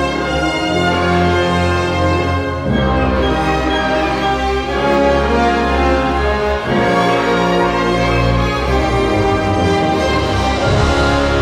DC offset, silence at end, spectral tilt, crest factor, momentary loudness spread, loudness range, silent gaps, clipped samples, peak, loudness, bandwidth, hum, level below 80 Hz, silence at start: under 0.1%; 0 s; -6 dB/octave; 12 dB; 3 LU; 1 LU; none; under 0.1%; -2 dBFS; -15 LUFS; 13.5 kHz; none; -24 dBFS; 0 s